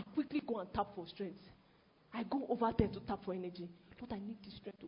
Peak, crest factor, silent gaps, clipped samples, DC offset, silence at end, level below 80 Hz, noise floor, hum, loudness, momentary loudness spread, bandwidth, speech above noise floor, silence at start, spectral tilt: -16 dBFS; 24 dB; none; under 0.1%; under 0.1%; 0 s; -60 dBFS; -69 dBFS; none; -41 LUFS; 15 LU; 5.2 kHz; 28 dB; 0 s; -6 dB/octave